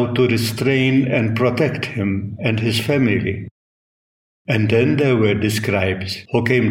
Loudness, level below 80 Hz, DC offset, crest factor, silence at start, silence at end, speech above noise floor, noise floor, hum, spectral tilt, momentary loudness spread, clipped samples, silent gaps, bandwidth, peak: -18 LUFS; -52 dBFS; under 0.1%; 16 dB; 0 s; 0 s; over 73 dB; under -90 dBFS; none; -6.5 dB/octave; 6 LU; under 0.1%; 3.51-4.45 s; 16.5 kHz; -2 dBFS